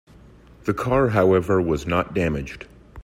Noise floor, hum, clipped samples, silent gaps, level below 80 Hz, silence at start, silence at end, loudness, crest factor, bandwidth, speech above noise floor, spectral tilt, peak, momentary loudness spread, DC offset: -48 dBFS; none; under 0.1%; none; -42 dBFS; 0.65 s; 0 s; -21 LUFS; 18 dB; 15.5 kHz; 27 dB; -7.5 dB/octave; -6 dBFS; 16 LU; under 0.1%